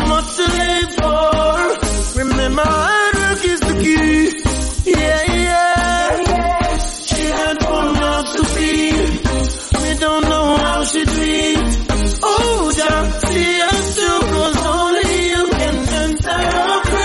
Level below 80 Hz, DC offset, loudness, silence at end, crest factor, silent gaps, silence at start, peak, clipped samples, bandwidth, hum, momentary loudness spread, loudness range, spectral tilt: -24 dBFS; under 0.1%; -15 LUFS; 0 s; 12 dB; none; 0 s; -4 dBFS; under 0.1%; 11.5 kHz; none; 4 LU; 2 LU; -4 dB/octave